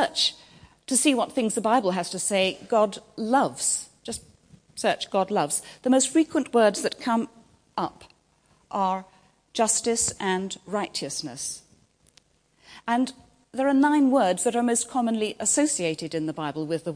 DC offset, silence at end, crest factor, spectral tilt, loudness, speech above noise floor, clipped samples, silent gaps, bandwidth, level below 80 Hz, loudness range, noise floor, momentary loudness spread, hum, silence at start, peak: under 0.1%; 0 s; 20 dB; -3 dB/octave; -24 LUFS; 39 dB; under 0.1%; none; 10.5 kHz; -64 dBFS; 5 LU; -63 dBFS; 12 LU; none; 0 s; -6 dBFS